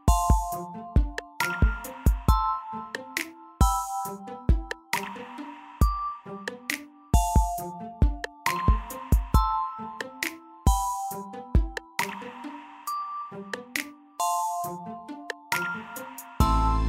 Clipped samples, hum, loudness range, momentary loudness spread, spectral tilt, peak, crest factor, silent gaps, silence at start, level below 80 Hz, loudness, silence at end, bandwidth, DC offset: under 0.1%; none; 5 LU; 14 LU; -5 dB/octave; -8 dBFS; 20 dB; none; 0.05 s; -30 dBFS; -29 LUFS; 0 s; 16 kHz; under 0.1%